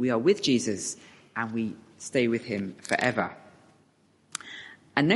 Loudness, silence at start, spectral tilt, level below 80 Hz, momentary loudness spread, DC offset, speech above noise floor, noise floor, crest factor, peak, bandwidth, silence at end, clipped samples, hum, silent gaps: -28 LUFS; 0 s; -4.5 dB/octave; -70 dBFS; 16 LU; under 0.1%; 37 dB; -64 dBFS; 24 dB; -6 dBFS; 11.5 kHz; 0 s; under 0.1%; none; none